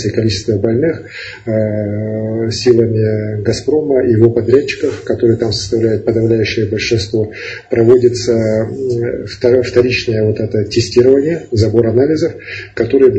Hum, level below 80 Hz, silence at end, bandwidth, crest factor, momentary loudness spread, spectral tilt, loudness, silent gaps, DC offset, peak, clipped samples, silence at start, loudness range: none; -42 dBFS; 0 s; 8.6 kHz; 12 dB; 8 LU; -6.5 dB/octave; -13 LUFS; none; under 0.1%; 0 dBFS; 0.2%; 0 s; 2 LU